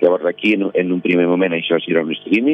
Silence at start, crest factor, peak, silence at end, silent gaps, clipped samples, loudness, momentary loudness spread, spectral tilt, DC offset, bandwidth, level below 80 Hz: 0 s; 14 dB; -2 dBFS; 0 s; none; under 0.1%; -17 LUFS; 3 LU; -8 dB/octave; under 0.1%; 6 kHz; -70 dBFS